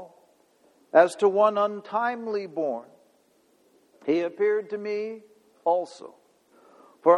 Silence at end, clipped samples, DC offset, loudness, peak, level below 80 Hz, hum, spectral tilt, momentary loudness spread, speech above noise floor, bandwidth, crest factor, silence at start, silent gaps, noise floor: 0 s; under 0.1%; under 0.1%; -25 LUFS; -6 dBFS; -82 dBFS; none; -5.5 dB/octave; 16 LU; 39 dB; 11.5 kHz; 22 dB; 0 s; none; -64 dBFS